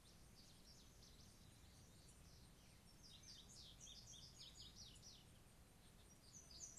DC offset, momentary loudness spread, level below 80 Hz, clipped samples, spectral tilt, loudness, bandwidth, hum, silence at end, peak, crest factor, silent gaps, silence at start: under 0.1%; 8 LU; -72 dBFS; under 0.1%; -2.5 dB/octave; -63 LUFS; 13 kHz; none; 0 s; -42 dBFS; 22 dB; none; 0 s